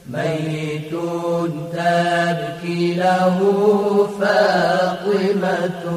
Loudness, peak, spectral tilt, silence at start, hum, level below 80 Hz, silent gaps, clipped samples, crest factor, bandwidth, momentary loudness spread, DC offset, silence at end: -19 LUFS; -4 dBFS; -6 dB/octave; 0.05 s; none; -60 dBFS; none; under 0.1%; 14 dB; 15.5 kHz; 9 LU; under 0.1%; 0 s